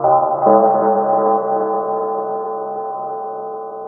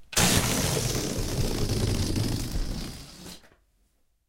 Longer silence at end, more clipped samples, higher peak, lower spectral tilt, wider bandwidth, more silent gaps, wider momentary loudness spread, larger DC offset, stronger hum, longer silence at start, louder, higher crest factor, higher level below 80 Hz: second, 0 s vs 0.9 s; neither; first, 0 dBFS vs -8 dBFS; first, -13 dB/octave vs -3.5 dB/octave; second, 2.1 kHz vs 17 kHz; neither; second, 13 LU vs 20 LU; neither; neither; about the same, 0 s vs 0 s; first, -17 LUFS vs -27 LUFS; about the same, 16 dB vs 20 dB; second, -64 dBFS vs -36 dBFS